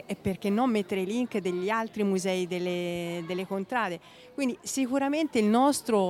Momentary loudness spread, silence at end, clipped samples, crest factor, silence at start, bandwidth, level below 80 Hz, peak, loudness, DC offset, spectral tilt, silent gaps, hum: 9 LU; 0 s; under 0.1%; 16 dB; 0.1 s; 16 kHz; -64 dBFS; -12 dBFS; -28 LUFS; under 0.1%; -5 dB/octave; none; none